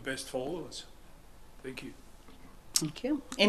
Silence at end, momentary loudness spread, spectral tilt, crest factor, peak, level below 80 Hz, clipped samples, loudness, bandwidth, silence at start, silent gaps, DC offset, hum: 0 s; 24 LU; -3 dB/octave; 32 dB; -4 dBFS; -58 dBFS; under 0.1%; -36 LUFS; 14.5 kHz; 0 s; none; under 0.1%; none